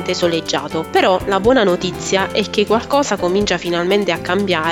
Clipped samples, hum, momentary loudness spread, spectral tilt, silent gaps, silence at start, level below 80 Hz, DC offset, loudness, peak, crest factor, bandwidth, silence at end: under 0.1%; none; 4 LU; -4 dB/octave; none; 0 s; -42 dBFS; under 0.1%; -16 LUFS; -2 dBFS; 14 dB; 18 kHz; 0 s